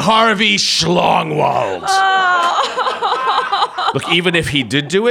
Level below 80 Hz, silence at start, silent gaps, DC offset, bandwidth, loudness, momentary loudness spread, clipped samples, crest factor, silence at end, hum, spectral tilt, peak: -48 dBFS; 0 s; none; under 0.1%; 17.5 kHz; -14 LUFS; 5 LU; under 0.1%; 12 dB; 0 s; none; -3.5 dB/octave; -2 dBFS